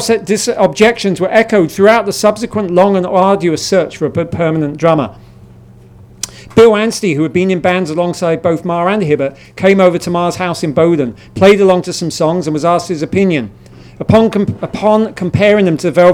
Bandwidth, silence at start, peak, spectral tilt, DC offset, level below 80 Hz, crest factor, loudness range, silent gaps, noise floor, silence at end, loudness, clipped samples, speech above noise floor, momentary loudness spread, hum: 17.5 kHz; 0 s; 0 dBFS; -5.5 dB/octave; under 0.1%; -46 dBFS; 12 dB; 3 LU; none; -38 dBFS; 0 s; -12 LUFS; 0.3%; 27 dB; 8 LU; none